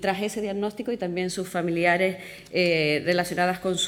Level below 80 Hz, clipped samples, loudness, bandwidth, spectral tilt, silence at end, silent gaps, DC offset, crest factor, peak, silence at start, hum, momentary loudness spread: -60 dBFS; under 0.1%; -25 LUFS; 17.5 kHz; -4.5 dB/octave; 0 s; none; under 0.1%; 18 dB; -8 dBFS; 0 s; none; 8 LU